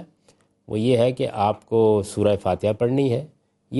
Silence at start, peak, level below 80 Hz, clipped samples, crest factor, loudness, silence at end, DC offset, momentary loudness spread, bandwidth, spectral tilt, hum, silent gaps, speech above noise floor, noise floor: 0 s; -6 dBFS; -58 dBFS; under 0.1%; 16 dB; -22 LUFS; 0 s; under 0.1%; 5 LU; 11.5 kHz; -7 dB/octave; none; none; 40 dB; -60 dBFS